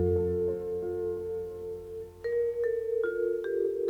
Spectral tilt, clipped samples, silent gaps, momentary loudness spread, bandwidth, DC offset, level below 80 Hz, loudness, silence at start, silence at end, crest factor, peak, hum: -9 dB/octave; under 0.1%; none; 10 LU; 4.5 kHz; under 0.1%; -58 dBFS; -32 LUFS; 0 s; 0 s; 14 dB; -18 dBFS; none